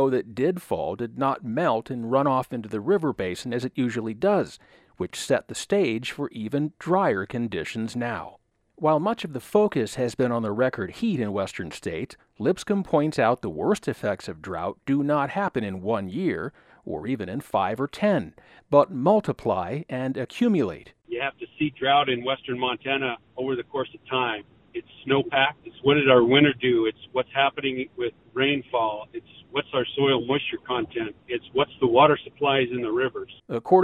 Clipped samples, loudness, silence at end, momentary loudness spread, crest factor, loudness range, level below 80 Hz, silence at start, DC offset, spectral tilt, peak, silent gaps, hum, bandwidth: under 0.1%; -25 LUFS; 0 s; 11 LU; 24 dB; 5 LU; -60 dBFS; 0 s; under 0.1%; -5.5 dB/octave; -2 dBFS; none; none; 14.5 kHz